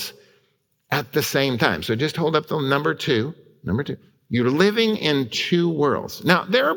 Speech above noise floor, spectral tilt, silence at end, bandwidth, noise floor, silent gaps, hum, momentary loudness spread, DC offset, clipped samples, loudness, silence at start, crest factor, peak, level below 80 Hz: 46 dB; -5 dB/octave; 0 s; 18 kHz; -67 dBFS; none; none; 9 LU; under 0.1%; under 0.1%; -21 LUFS; 0 s; 20 dB; -2 dBFS; -56 dBFS